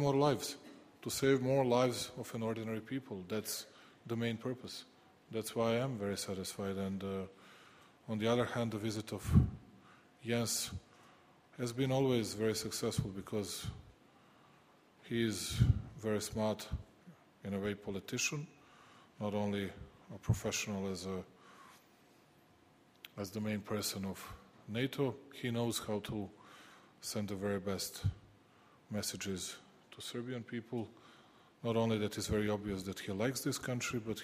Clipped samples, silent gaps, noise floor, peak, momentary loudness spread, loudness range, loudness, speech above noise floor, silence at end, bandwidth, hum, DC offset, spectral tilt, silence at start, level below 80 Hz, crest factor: under 0.1%; none; -66 dBFS; -14 dBFS; 18 LU; 6 LU; -38 LUFS; 30 dB; 0 s; 15.5 kHz; none; under 0.1%; -5 dB/octave; 0 s; -56 dBFS; 24 dB